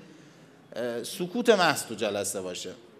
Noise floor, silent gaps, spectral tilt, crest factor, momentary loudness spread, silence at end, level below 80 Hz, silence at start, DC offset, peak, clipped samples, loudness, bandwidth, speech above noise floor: -53 dBFS; none; -3 dB/octave; 24 dB; 14 LU; 0 s; -84 dBFS; 0 s; under 0.1%; -6 dBFS; under 0.1%; -28 LUFS; 15.5 kHz; 26 dB